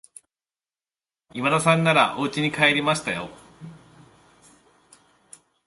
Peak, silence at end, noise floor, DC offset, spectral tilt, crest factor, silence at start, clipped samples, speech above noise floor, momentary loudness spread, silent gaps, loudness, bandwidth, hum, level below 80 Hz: -4 dBFS; 1.9 s; under -90 dBFS; under 0.1%; -4.5 dB/octave; 22 dB; 1.35 s; under 0.1%; over 69 dB; 18 LU; none; -21 LUFS; 11.5 kHz; none; -62 dBFS